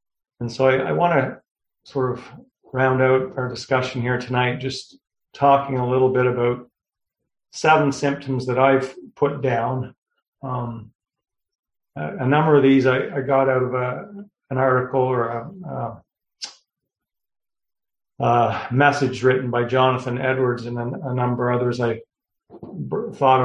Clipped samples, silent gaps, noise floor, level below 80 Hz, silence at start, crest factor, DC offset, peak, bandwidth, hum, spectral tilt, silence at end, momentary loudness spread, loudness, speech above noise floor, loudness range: under 0.1%; 1.51-1.55 s, 9.98-10.02 s, 10.28-10.32 s, 10.95-10.99 s, 11.55-11.63 s; -83 dBFS; -58 dBFS; 0.4 s; 20 dB; under 0.1%; -2 dBFS; 10 kHz; none; -6.5 dB/octave; 0 s; 15 LU; -21 LUFS; 63 dB; 5 LU